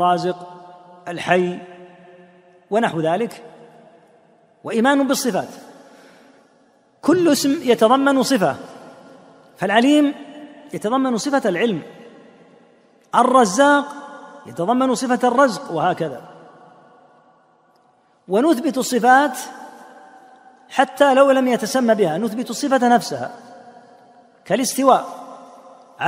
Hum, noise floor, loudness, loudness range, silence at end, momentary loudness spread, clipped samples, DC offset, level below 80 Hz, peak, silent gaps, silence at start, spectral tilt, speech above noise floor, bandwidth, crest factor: none; -58 dBFS; -18 LUFS; 6 LU; 0 s; 21 LU; under 0.1%; under 0.1%; -68 dBFS; 0 dBFS; none; 0 s; -4.5 dB/octave; 40 dB; 16 kHz; 20 dB